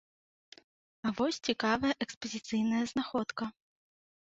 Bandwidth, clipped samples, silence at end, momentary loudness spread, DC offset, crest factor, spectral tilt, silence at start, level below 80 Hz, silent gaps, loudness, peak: 8 kHz; under 0.1%; 0.7 s; 9 LU; under 0.1%; 22 dB; -4 dB/octave; 1.05 s; -66 dBFS; 2.17-2.21 s; -33 LUFS; -12 dBFS